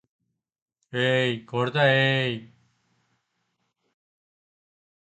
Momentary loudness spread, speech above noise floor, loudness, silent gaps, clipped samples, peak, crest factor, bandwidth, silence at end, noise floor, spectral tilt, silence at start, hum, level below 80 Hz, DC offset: 11 LU; 53 dB; -23 LUFS; none; under 0.1%; -8 dBFS; 20 dB; 8.8 kHz; 2.65 s; -76 dBFS; -6 dB/octave; 0.95 s; none; -70 dBFS; under 0.1%